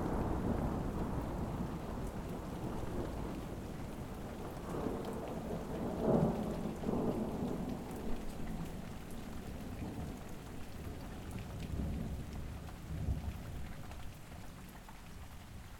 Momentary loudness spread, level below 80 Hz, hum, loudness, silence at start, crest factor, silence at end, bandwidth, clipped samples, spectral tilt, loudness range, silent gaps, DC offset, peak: 13 LU; -46 dBFS; none; -41 LUFS; 0 s; 20 dB; 0 s; 18.5 kHz; under 0.1%; -7 dB/octave; 8 LU; none; under 0.1%; -20 dBFS